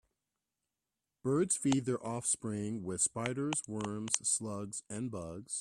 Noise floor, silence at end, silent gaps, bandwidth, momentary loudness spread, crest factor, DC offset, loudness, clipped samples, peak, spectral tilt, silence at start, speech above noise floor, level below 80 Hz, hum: -90 dBFS; 0 s; none; 13.5 kHz; 10 LU; 28 dB; under 0.1%; -35 LUFS; under 0.1%; -10 dBFS; -4 dB/octave; 1.25 s; 54 dB; -70 dBFS; none